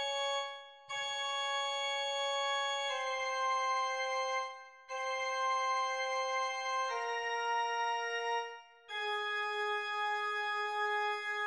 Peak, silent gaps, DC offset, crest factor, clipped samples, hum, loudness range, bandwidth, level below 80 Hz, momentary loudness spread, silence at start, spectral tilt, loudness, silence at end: -24 dBFS; none; under 0.1%; 12 dB; under 0.1%; none; 2 LU; 11.5 kHz; under -90 dBFS; 6 LU; 0 s; 2.5 dB/octave; -35 LUFS; 0 s